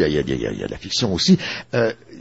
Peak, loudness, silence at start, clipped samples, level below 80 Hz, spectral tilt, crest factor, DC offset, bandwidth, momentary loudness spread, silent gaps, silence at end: -4 dBFS; -21 LUFS; 0 s; under 0.1%; -42 dBFS; -5 dB/octave; 18 dB; 0.2%; 8 kHz; 8 LU; none; 0 s